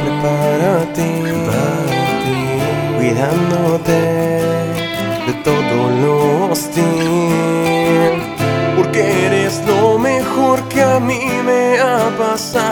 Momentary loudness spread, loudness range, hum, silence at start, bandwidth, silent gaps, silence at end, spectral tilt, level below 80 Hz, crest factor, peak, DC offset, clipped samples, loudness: 4 LU; 2 LU; none; 0 s; over 20 kHz; none; 0 s; -5.5 dB/octave; -44 dBFS; 14 dB; 0 dBFS; under 0.1%; under 0.1%; -15 LUFS